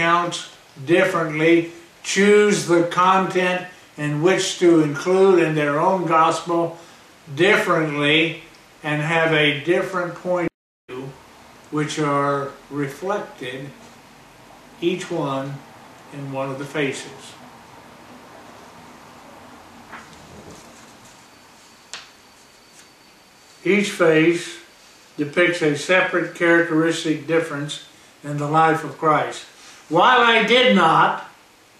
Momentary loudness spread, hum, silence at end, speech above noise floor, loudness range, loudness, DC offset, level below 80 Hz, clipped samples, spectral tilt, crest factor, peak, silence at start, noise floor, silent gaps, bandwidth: 20 LU; none; 0.5 s; 31 dB; 11 LU; -19 LUFS; under 0.1%; -66 dBFS; under 0.1%; -4.5 dB/octave; 18 dB; -2 dBFS; 0 s; -50 dBFS; 10.54-10.88 s; 14 kHz